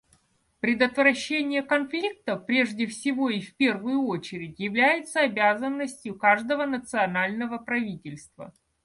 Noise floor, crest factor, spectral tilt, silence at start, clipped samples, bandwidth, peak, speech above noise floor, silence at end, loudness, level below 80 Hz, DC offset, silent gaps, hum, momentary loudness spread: -66 dBFS; 20 dB; -4.5 dB/octave; 0.65 s; under 0.1%; 11.5 kHz; -6 dBFS; 40 dB; 0.35 s; -25 LUFS; -66 dBFS; under 0.1%; none; none; 11 LU